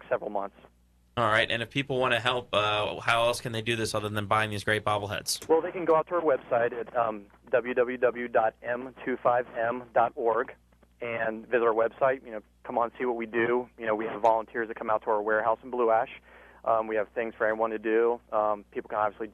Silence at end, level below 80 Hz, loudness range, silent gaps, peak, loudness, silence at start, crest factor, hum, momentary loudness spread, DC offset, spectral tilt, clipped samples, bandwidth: 0.05 s; -62 dBFS; 2 LU; none; -8 dBFS; -28 LUFS; 0.05 s; 20 dB; none; 9 LU; under 0.1%; -4.5 dB/octave; under 0.1%; 13 kHz